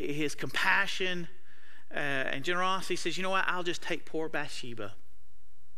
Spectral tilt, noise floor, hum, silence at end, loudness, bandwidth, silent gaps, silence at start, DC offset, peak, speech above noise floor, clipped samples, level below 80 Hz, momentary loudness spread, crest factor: -3.5 dB/octave; -66 dBFS; none; 0.85 s; -32 LUFS; 16 kHz; none; 0 s; 3%; -10 dBFS; 33 dB; under 0.1%; -66 dBFS; 14 LU; 22 dB